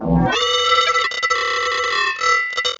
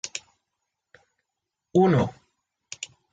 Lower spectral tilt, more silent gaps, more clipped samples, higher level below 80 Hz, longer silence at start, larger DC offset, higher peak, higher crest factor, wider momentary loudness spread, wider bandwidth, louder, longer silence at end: second, -3 dB/octave vs -6 dB/octave; neither; neither; first, -38 dBFS vs -60 dBFS; about the same, 0 s vs 0.05 s; neither; first, -4 dBFS vs -10 dBFS; about the same, 14 dB vs 18 dB; second, 4 LU vs 18 LU; first, 13 kHz vs 9.4 kHz; first, -16 LUFS vs -23 LUFS; second, 0.05 s vs 0.3 s